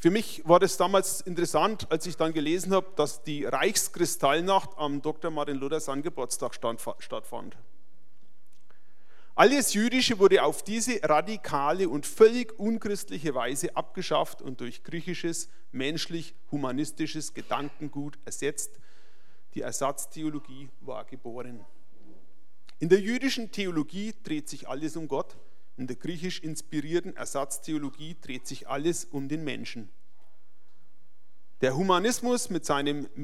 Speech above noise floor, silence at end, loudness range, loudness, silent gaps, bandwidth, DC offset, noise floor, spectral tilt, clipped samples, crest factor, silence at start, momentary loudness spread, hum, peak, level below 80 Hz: 42 dB; 0 s; 11 LU; -28 LUFS; none; 16 kHz; 2%; -71 dBFS; -4 dB/octave; under 0.1%; 26 dB; 0 s; 17 LU; none; -4 dBFS; -70 dBFS